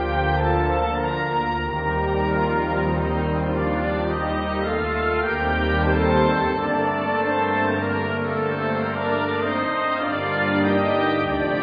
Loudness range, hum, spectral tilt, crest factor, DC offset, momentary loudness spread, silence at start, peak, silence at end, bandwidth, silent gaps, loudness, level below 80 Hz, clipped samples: 2 LU; none; -9 dB/octave; 16 dB; under 0.1%; 4 LU; 0 s; -6 dBFS; 0 s; 5 kHz; none; -22 LUFS; -34 dBFS; under 0.1%